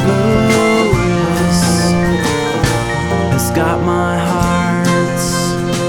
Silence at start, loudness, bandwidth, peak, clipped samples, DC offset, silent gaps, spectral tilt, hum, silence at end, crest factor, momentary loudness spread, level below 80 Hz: 0 s; -14 LUFS; 18.5 kHz; 0 dBFS; under 0.1%; under 0.1%; none; -5.5 dB/octave; none; 0 s; 12 dB; 4 LU; -30 dBFS